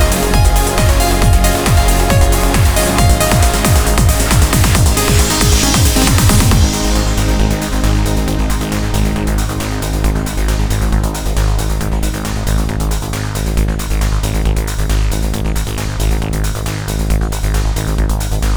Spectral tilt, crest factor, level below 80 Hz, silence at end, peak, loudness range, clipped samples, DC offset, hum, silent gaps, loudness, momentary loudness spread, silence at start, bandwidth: -4.5 dB/octave; 12 dB; -16 dBFS; 0 s; 0 dBFS; 6 LU; under 0.1%; 0.7%; none; none; -14 LUFS; 8 LU; 0 s; over 20 kHz